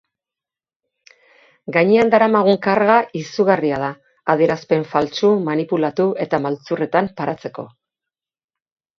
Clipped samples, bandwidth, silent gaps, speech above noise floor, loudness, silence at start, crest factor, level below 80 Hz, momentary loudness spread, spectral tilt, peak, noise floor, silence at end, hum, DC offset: under 0.1%; 7.4 kHz; none; over 73 dB; -18 LUFS; 1.7 s; 18 dB; -60 dBFS; 13 LU; -6.5 dB/octave; 0 dBFS; under -90 dBFS; 1.3 s; none; under 0.1%